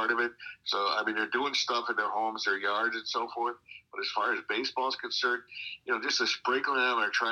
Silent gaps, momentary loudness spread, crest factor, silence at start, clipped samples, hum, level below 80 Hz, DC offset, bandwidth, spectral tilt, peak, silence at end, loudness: none; 7 LU; 16 dB; 0 s; under 0.1%; none; -78 dBFS; under 0.1%; 12.5 kHz; -1 dB/octave; -14 dBFS; 0 s; -30 LUFS